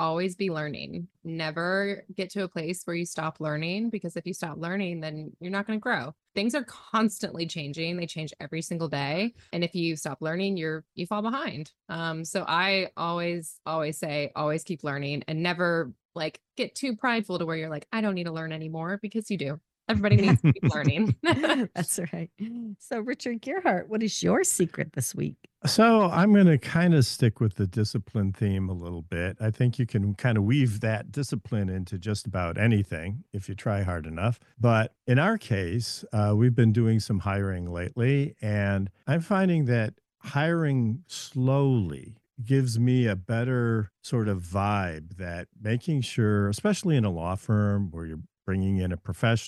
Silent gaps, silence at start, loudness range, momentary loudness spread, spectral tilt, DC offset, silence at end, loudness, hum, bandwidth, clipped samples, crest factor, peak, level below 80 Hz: 16.05-16.09 s; 0 s; 7 LU; 12 LU; -6 dB/octave; under 0.1%; 0 s; -27 LUFS; none; 12.5 kHz; under 0.1%; 18 dB; -8 dBFS; -56 dBFS